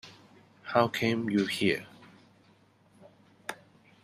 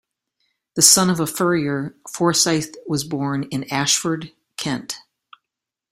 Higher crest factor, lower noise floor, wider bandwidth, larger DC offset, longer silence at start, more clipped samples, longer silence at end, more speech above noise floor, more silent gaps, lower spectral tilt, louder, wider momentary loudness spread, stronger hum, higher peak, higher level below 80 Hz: about the same, 24 dB vs 22 dB; second, -63 dBFS vs -85 dBFS; second, 14.5 kHz vs 16 kHz; neither; second, 0.05 s vs 0.75 s; neither; second, 0.5 s vs 0.9 s; second, 35 dB vs 65 dB; neither; first, -5.5 dB/octave vs -3 dB/octave; second, -29 LUFS vs -19 LUFS; first, 24 LU vs 17 LU; neither; second, -8 dBFS vs 0 dBFS; second, -70 dBFS vs -58 dBFS